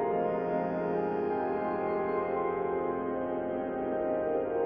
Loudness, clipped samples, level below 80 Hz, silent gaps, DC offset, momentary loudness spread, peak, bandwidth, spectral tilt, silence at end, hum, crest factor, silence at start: -32 LUFS; under 0.1%; -62 dBFS; none; under 0.1%; 3 LU; -18 dBFS; 5.2 kHz; -7 dB/octave; 0 s; none; 12 dB; 0 s